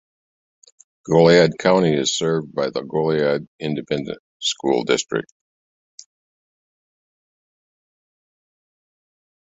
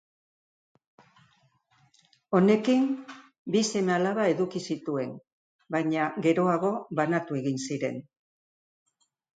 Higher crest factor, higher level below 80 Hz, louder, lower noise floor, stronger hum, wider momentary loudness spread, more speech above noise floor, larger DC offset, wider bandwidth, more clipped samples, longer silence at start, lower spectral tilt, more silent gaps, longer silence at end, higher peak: about the same, 20 dB vs 20 dB; first, -60 dBFS vs -76 dBFS; first, -19 LUFS vs -27 LUFS; first, under -90 dBFS vs -67 dBFS; neither; about the same, 13 LU vs 11 LU; first, over 71 dB vs 40 dB; neither; second, 8.4 kHz vs 9.4 kHz; neither; second, 1.05 s vs 2.3 s; about the same, -4.5 dB/octave vs -5.5 dB/octave; about the same, 3.48-3.59 s, 4.20-4.40 s vs 3.39-3.45 s, 5.32-5.59 s; first, 4.3 s vs 1.35 s; first, -2 dBFS vs -10 dBFS